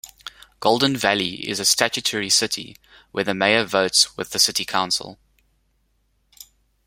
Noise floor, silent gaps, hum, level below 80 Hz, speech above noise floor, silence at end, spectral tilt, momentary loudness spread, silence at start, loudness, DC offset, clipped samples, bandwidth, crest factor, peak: -66 dBFS; none; none; -60 dBFS; 45 dB; 1.7 s; -1.5 dB/octave; 15 LU; 0.05 s; -19 LUFS; under 0.1%; under 0.1%; 16.5 kHz; 24 dB; 0 dBFS